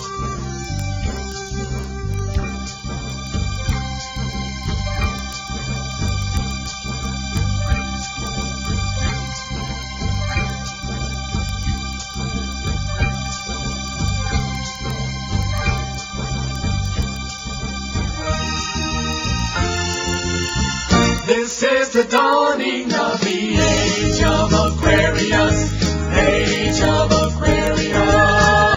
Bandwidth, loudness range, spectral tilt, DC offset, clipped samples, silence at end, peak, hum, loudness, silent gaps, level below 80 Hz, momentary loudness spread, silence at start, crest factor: 16 kHz; 8 LU; -4.5 dB/octave; under 0.1%; under 0.1%; 0 s; 0 dBFS; none; -20 LUFS; none; -28 dBFS; 11 LU; 0 s; 18 dB